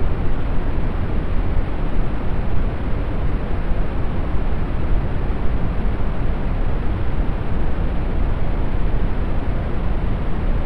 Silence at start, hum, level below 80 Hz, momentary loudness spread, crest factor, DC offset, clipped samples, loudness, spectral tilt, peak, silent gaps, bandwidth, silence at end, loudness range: 0 s; none; -20 dBFS; 1 LU; 12 dB; under 0.1%; under 0.1%; -25 LUFS; -9.5 dB/octave; -6 dBFS; none; 4.5 kHz; 0 s; 0 LU